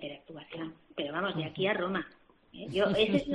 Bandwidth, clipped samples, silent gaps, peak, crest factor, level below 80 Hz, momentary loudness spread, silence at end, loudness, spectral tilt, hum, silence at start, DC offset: 10 kHz; under 0.1%; none; -14 dBFS; 18 dB; -62 dBFS; 18 LU; 0 s; -32 LUFS; -6.5 dB/octave; none; 0 s; under 0.1%